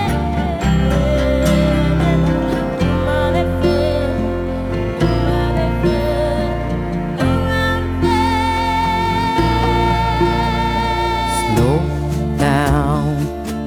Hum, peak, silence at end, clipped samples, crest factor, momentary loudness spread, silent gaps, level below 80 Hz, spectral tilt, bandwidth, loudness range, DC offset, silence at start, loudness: none; -2 dBFS; 0 s; under 0.1%; 12 dB; 5 LU; none; -24 dBFS; -6.5 dB/octave; 18.5 kHz; 2 LU; under 0.1%; 0 s; -17 LUFS